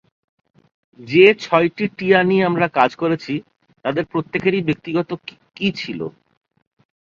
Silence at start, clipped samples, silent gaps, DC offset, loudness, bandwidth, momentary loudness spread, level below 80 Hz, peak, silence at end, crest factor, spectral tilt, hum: 1 s; under 0.1%; none; under 0.1%; -18 LUFS; 7.2 kHz; 15 LU; -60 dBFS; 0 dBFS; 0.9 s; 20 dB; -7 dB/octave; none